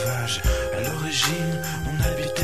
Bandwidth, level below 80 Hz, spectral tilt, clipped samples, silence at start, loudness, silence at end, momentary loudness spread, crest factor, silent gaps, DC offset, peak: 15.5 kHz; -32 dBFS; -4 dB/octave; under 0.1%; 0 s; -24 LUFS; 0 s; 5 LU; 14 dB; none; 0.8%; -10 dBFS